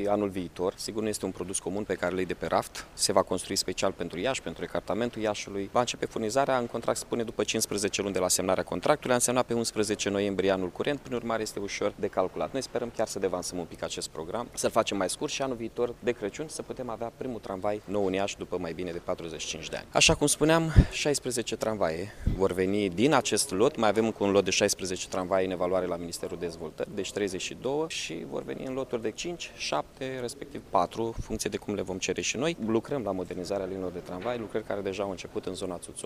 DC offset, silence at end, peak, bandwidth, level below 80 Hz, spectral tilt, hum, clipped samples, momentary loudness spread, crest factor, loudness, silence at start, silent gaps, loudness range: under 0.1%; 0 s; -4 dBFS; 15.5 kHz; -44 dBFS; -4 dB/octave; none; under 0.1%; 11 LU; 24 dB; -29 LUFS; 0 s; none; 7 LU